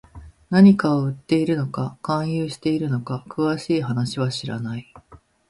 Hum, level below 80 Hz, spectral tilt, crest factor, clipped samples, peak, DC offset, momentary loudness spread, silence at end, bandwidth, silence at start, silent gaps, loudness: none; -54 dBFS; -7.5 dB/octave; 18 dB; under 0.1%; -4 dBFS; under 0.1%; 14 LU; 0.35 s; 11.5 kHz; 0.15 s; none; -21 LUFS